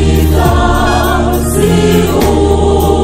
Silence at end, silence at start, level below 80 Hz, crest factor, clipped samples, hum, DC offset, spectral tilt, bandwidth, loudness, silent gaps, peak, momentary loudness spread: 0 s; 0 s; -16 dBFS; 8 dB; 0.3%; none; under 0.1%; -6 dB/octave; 16.5 kHz; -10 LUFS; none; 0 dBFS; 2 LU